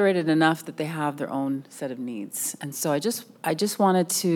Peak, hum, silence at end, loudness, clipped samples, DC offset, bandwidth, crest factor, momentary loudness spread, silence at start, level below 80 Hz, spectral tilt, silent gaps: -6 dBFS; none; 0 s; -26 LUFS; under 0.1%; under 0.1%; 19 kHz; 18 dB; 11 LU; 0 s; -86 dBFS; -4.5 dB/octave; none